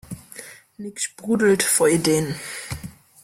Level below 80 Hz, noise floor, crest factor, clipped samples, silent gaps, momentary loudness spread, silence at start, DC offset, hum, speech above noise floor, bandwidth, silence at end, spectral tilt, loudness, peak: -54 dBFS; -42 dBFS; 16 dB; under 0.1%; none; 22 LU; 0.1 s; under 0.1%; none; 21 dB; 16.5 kHz; 0.35 s; -3.5 dB/octave; -20 LUFS; -6 dBFS